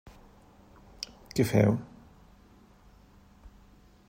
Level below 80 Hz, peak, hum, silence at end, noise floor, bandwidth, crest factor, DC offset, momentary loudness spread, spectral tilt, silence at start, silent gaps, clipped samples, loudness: -56 dBFS; -10 dBFS; none; 0.6 s; -57 dBFS; 16 kHz; 24 dB; under 0.1%; 18 LU; -6.5 dB/octave; 1 s; none; under 0.1%; -29 LUFS